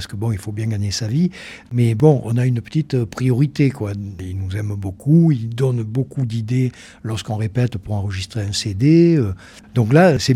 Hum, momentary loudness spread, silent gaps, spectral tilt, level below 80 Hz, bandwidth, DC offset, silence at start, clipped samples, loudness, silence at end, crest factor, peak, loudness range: none; 13 LU; none; -7 dB/octave; -50 dBFS; 13 kHz; under 0.1%; 0 s; under 0.1%; -19 LUFS; 0 s; 18 dB; 0 dBFS; 3 LU